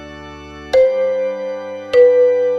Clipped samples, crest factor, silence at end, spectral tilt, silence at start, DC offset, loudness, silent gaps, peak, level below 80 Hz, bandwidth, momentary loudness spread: under 0.1%; 14 dB; 0 s; -5 dB/octave; 0 s; under 0.1%; -14 LUFS; none; -2 dBFS; -48 dBFS; 6.2 kHz; 22 LU